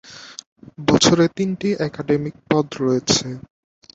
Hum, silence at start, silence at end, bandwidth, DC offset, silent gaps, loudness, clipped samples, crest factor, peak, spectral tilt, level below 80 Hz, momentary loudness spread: none; 0.05 s; 0.55 s; 8.4 kHz; under 0.1%; 0.46-0.56 s; -19 LUFS; under 0.1%; 20 dB; -2 dBFS; -4.5 dB/octave; -50 dBFS; 21 LU